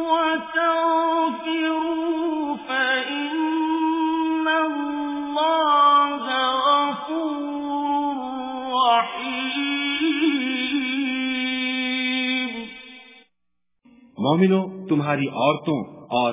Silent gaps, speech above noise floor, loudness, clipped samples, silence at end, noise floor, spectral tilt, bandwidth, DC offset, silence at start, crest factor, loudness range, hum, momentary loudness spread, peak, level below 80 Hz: none; 61 dB; -22 LUFS; under 0.1%; 0 s; -82 dBFS; -9 dB/octave; 3.9 kHz; under 0.1%; 0 s; 16 dB; 4 LU; none; 8 LU; -6 dBFS; -66 dBFS